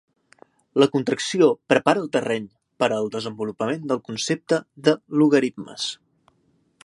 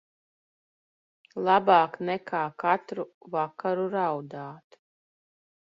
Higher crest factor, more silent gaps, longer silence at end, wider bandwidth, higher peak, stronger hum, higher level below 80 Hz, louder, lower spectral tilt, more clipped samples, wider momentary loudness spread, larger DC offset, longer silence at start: about the same, 22 dB vs 24 dB; second, none vs 3.14-3.21 s; second, 0.95 s vs 1.2 s; first, 11.5 kHz vs 7.4 kHz; first, -2 dBFS vs -6 dBFS; neither; first, -70 dBFS vs -78 dBFS; first, -22 LUFS vs -27 LUFS; second, -5 dB/octave vs -7.5 dB/octave; neither; second, 10 LU vs 17 LU; neither; second, 0.75 s vs 1.35 s